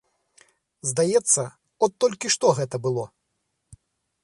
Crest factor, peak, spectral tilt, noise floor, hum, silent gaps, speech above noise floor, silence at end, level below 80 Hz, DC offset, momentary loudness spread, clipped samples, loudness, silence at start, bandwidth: 20 dB; -6 dBFS; -3.5 dB/octave; -76 dBFS; none; none; 54 dB; 0.5 s; -64 dBFS; under 0.1%; 11 LU; under 0.1%; -23 LUFS; 0.85 s; 11.5 kHz